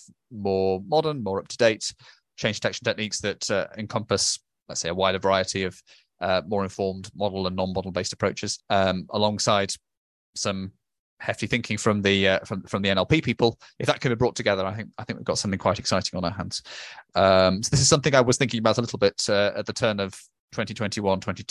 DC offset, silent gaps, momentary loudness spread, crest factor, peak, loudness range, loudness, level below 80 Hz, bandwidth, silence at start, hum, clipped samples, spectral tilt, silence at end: under 0.1%; 9.97-10.33 s, 10.99-11.17 s, 20.39-20.48 s; 12 LU; 22 dB; -2 dBFS; 5 LU; -24 LUFS; -50 dBFS; 12 kHz; 0.3 s; none; under 0.1%; -4 dB/octave; 0.1 s